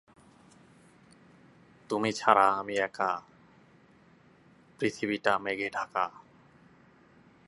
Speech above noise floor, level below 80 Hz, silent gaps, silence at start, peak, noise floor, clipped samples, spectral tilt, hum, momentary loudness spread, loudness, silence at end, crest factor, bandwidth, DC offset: 31 dB; -74 dBFS; none; 1.9 s; -4 dBFS; -60 dBFS; under 0.1%; -4.5 dB/octave; none; 10 LU; -29 LUFS; 1.4 s; 28 dB; 11.5 kHz; under 0.1%